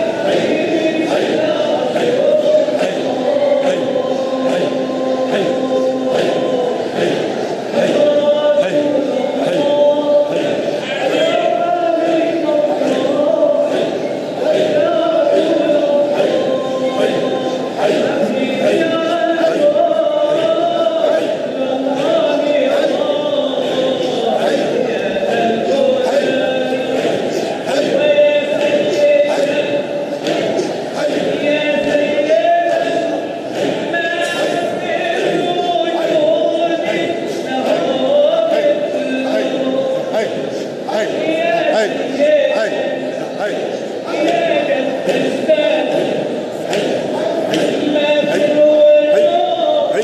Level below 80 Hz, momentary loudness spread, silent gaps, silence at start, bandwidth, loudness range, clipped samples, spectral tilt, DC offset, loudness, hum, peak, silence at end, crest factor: -64 dBFS; 6 LU; none; 0 s; 12.5 kHz; 2 LU; under 0.1%; -5 dB/octave; under 0.1%; -15 LUFS; none; -2 dBFS; 0 s; 12 dB